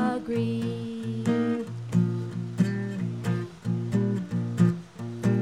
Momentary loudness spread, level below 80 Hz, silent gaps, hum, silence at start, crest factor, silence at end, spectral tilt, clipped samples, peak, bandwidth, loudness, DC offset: 7 LU; -62 dBFS; none; none; 0 s; 16 dB; 0 s; -8 dB/octave; under 0.1%; -10 dBFS; 11.5 kHz; -28 LUFS; 0.1%